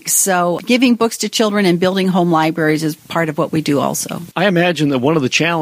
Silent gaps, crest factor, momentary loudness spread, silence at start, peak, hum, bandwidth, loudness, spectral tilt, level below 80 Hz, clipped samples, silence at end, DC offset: none; 14 dB; 6 LU; 0.05 s; 0 dBFS; none; 15.5 kHz; -15 LUFS; -4 dB/octave; -58 dBFS; under 0.1%; 0 s; under 0.1%